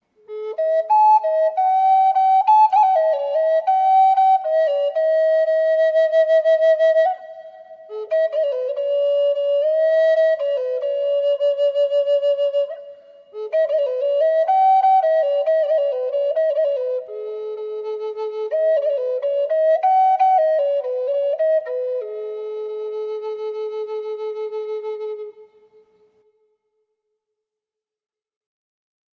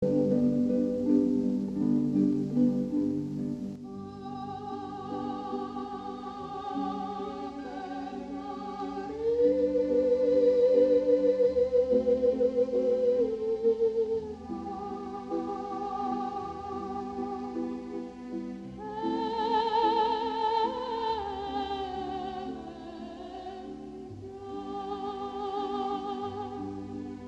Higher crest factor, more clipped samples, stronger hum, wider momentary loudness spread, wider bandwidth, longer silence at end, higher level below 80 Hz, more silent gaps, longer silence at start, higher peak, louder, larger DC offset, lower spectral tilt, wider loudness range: about the same, 12 dB vs 16 dB; neither; neither; about the same, 14 LU vs 14 LU; second, 6.4 kHz vs 7.8 kHz; first, 3.75 s vs 0 s; second, -88 dBFS vs -58 dBFS; neither; first, 0.3 s vs 0 s; first, -6 dBFS vs -12 dBFS; first, -18 LUFS vs -30 LUFS; neither; second, -1.5 dB/octave vs -7.5 dB/octave; about the same, 12 LU vs 12 LU